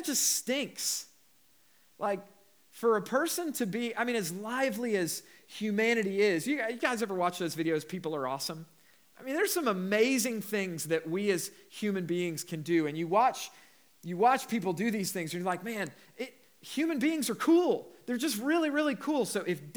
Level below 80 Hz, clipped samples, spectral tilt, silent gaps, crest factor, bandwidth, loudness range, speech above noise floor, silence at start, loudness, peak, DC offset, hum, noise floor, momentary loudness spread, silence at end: under -90 dBFS; under 0.1%; -3.5 dB/octave; none; 20 dB; over 20 kHz; 3 LU; 35 dB; 0 s; -31 LUFS; -12 dBFS; under 0.1%; none; -66 dBFS; 11 LU; 0.05 s